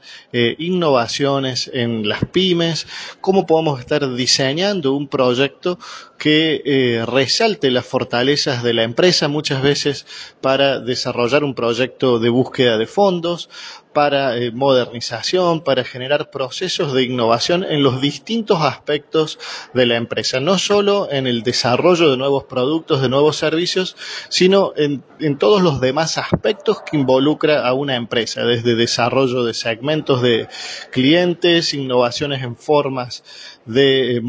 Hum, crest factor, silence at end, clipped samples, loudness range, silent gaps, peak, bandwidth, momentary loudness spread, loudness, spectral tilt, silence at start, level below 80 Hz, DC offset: none; 16 dB; 0 s; under 0.1%; 2 LU; none; 0 dBFS; 8 kHz; 8 LU; -17 LUFS; -4.5 dB/octave; 0.05 s; -52 dBFS; under 0.1%